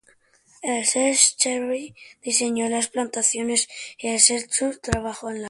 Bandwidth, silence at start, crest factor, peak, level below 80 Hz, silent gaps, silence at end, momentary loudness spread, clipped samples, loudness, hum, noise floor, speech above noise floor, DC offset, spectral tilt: 11.5 kHz; 0.6 s; 24 dB; 0 dBFS; -48 dBFS; none; 0 s; 14 LU; under 0.1%; -21 LUFS; none; -59 dBFS; 36 dB; under 0.1%; -1.5 dB/octave